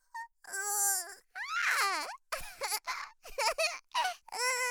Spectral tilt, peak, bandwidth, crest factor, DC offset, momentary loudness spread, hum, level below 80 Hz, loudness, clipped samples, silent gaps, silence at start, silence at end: 2.5 dB/octave; -16 dBFS; over 20 kHz; 20 dB; under 0.1%; 13 LU; none; -62 dBFS; -33 LUFS; under 0.1%; none; 0.15 s; 0 s